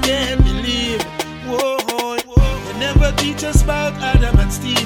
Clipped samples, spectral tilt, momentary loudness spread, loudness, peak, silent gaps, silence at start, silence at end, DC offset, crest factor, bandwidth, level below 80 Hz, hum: under 0.1%; -4.5 dB/octave; 6 LU; -18 LUFS; 0 dBFS; none; 0 s; 0 s; under 0.1%; 16 dB; 18 kHz; -18 dBFS; none